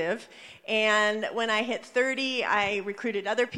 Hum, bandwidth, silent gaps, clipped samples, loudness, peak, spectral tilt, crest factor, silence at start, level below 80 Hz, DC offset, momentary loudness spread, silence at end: none; 12 kHz; none; under 0.1%; -27 LUFS; -10 dBFS; -3 dB/octave; 18 dB; 0 s; -72 dBFS; under 0.1%; 8 LU; 0 s